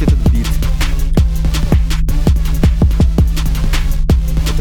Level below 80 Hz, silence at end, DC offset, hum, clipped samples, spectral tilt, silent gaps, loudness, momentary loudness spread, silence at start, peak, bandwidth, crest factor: -12 dBFS; 0 s; under 0.1%; none; under 0.1%; -6.5 dB/octave; none; -15 LUFS; 5 LU; 0 s; 0 dBFS; 18 kHz; 10 dB